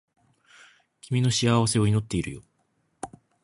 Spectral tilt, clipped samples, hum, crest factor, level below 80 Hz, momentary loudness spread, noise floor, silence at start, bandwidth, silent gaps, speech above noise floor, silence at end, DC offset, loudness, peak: -5 dB/octave; under 0.1%; none; 20 dB; -52 dBFS; 20 LU; -71 dBFS; 1.05 s; 11.5 kHz; none; 48 dB; 0.35 s; under 0.1%; -24 LUFS; -8 dBFS